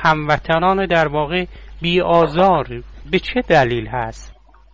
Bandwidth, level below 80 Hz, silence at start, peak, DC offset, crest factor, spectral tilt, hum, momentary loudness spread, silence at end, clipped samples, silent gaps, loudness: 7.8 kHz; -36 dBFS; 0 s; -2 dBFS; under 0.1%; 14 dB; -6.5 dB/octave; none; 11 LU; 0.4 s; under 0.1%; none; -17 LUFS